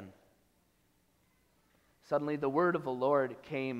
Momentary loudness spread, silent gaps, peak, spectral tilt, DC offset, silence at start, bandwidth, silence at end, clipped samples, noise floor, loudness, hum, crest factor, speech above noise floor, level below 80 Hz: 6 LU; none; -16 dBFS; -8 dB/octave; under 0.1%; 0 s; 13.5 kHz; 0 s; under 0.1%; -72 dBFS; -33 LUFS; none; 18 dB; 40 dB; -76 dBFS